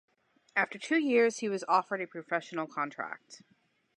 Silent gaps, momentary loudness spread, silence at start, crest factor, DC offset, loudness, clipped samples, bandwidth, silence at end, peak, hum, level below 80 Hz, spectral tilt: none; 11 LU; 0.55 s; 20 dB; under 0.1%; -31 LUFS; under 0.1%; 10.5 kHz; 0.6 s; -12 dBFS; none; -88 dBFS; -4 dB/octave